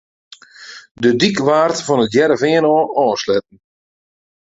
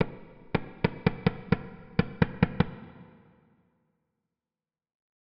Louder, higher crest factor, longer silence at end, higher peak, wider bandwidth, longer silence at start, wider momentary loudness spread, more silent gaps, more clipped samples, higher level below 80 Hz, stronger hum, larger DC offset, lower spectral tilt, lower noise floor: first, -15 LUFS vs -30 LUFS; second, 16 dB vs 26 dB; second, 1.1 s vs 2.3 s; first, 0 dBFS vs -6 dBFS; first, 8 kHz vs 5.6 kHz; first, 0.6 s vs 0 s; about the same, 8 LU vs 9 LU; first, 0.91-0.95 s vs none; neither; second, -56 dBFS vs -48 dBFS; neither; neither; second, -5 dB/octave vs -6.5 dB/octave; second, -38 dBFS vs under -90 dBFS